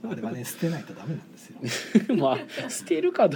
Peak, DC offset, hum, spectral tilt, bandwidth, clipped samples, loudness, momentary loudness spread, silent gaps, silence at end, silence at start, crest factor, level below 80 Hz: -6 dBFS; under 0.1%; none; -5.5 dB/octave; 19 kHz; under 0.1%; -27 LUFS; 14 LU; none; 0 s; 0.05 s; 20 dB; -74 dBFS